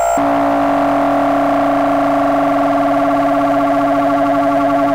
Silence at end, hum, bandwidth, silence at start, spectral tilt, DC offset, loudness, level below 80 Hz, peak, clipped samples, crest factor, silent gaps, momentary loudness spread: 0 s; none; 16 kHz; 0 s; -6 dB/octave; 0.8%; -14 LUFS; -44 dBFS; -6 dBFS; under 0.1%; 6 dB; none; 0 LU